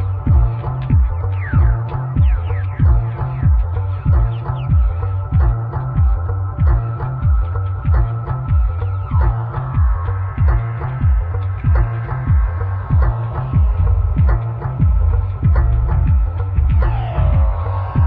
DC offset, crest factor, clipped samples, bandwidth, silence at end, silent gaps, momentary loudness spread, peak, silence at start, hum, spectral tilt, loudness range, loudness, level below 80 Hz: under 0.1%; 12 dB; under 0.1%; 3.6 kHz; 0 s; none; 5 LU; -4 dBFS; 0 s; none; -12 dB/octave; 2 LU; -18 LUFS; -18 dBFS